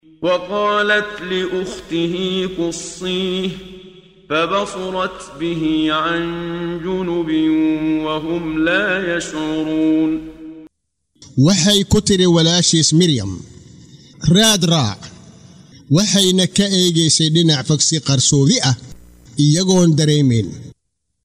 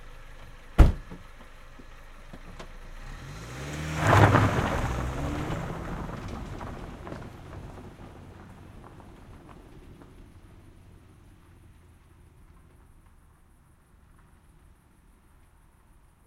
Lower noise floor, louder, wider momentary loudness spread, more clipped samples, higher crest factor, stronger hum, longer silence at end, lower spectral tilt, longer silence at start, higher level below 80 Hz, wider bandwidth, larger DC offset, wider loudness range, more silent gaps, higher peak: first, -73 dBFS vs -58 dBFS; first, -16 LUFS vs -27 LUFS; second, 12 LU vs 28 LU; neither; second, 14 dB vs 28 dB; neither; second, 0.5 s vs 5.55 s; second, -4 dB/octave vs -6.5 dB/octave; first, 0.2 s vs 0 s; second, -44 dBFS vs -36 dBFS; about the same, 16 kHz vs 15.5 kHz; neither; second, 7 LU vs 24 LU; neither; about the same, -2 dBFS vs -2 dBFS